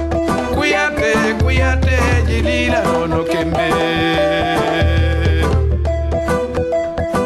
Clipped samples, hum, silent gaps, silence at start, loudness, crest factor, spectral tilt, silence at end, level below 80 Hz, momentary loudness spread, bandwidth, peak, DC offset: under 0.1%; none; none; 0 s; -16 LUFS; 12 dB; -6 dB/octave; 0 s; -22 dBFS; 4 LU; 12.5 kHz; -2 dBFS; under 0.1%